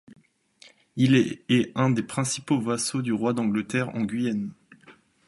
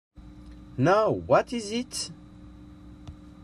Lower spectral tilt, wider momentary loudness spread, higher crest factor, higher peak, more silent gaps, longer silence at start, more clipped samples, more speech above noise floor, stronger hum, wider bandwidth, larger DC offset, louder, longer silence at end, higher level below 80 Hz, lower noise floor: about the same, -5.5 dB/octave vs -5 dB/octave; second, 7 LU vs 25 LU; about the same, 18 dB vs 20 dB; about the same, -8 dBFS vs -10 dBFS; neither; first, 0.95 s vs 0.2 s; neither; first, 32 dB vs 22 dB; neither; second, 11.5 kHz vs 13.5 kHz; neither; about the same, -25 LUFS vs -26 LUFS; first, 0.35 s vs 0.15 s; second, -64 dBFS vs -52 dBFS; first, -57 dBFS vs -47 dBFS